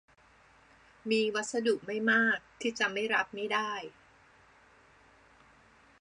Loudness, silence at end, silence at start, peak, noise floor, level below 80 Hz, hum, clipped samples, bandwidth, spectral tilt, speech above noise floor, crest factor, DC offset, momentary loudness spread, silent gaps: -30 LUFS; 2.1 s; 1.05 s; -14 dBFS; -62 dBFS; -74 dBFS; none; under 0.1%; 11 kHz; -3 dB/octave; 31 dB; 20 dB; under 0.1%; 11 LU; none